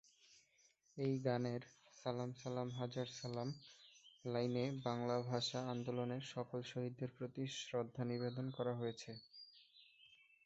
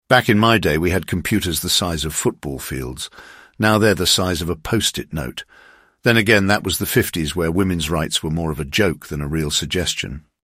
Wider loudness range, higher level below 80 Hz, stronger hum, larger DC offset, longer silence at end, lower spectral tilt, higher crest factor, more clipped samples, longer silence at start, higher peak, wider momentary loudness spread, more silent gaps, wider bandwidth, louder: about the same, 3 LU vs 2 LU; second, -80 dBFS vs -38 dBFS; neither; neither; about the same, 0.3 s vs 0.25 s; first, -5.5 dB/octave vs -4 dB/octave; about the same, 20 dB vs 18 dB; neither; first, 0.3 s vs 0.1 s; second, -24 dBFS vs 0 dBFS; first, 19 LU vs 12 LU; neither; second, 8 kHz vs 16 kHz; second, -44 LUFS vs -19 LUFS